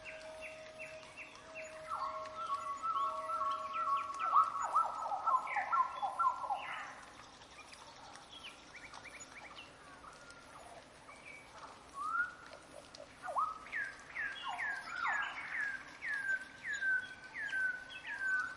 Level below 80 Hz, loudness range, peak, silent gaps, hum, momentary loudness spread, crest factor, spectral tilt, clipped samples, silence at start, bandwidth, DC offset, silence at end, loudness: -74 dBFS; 17 LU; -18 dBFS; none; none; 19 LU; 22 dB; -1.5 dB/octave; under 0.1%; 0 s; 11.5 kHz; under 0.1%; 0 s; -38 LUFS